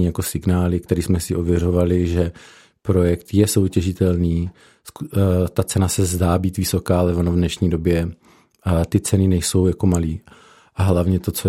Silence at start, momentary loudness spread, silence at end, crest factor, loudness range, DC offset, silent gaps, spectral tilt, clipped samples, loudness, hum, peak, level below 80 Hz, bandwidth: 0 s; 7 LU; 0 s; 18 dB; 1 LU; under 0.1%; none; -6.5 dB/octave; under 0.1%; -19 LUFS; none; -2 dBFS; -40 dBFS; 16 kHz